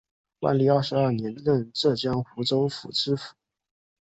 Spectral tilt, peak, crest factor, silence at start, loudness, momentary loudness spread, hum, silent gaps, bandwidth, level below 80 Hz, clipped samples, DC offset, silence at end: -6.5 dB/octave; -8 dBFS; 18 dB; 0.4 s; -25 LUFS; 7 LU; none; none; 8.2 kHz; -60 dBFS; under 0.1%; under 0.1%; 0.75 s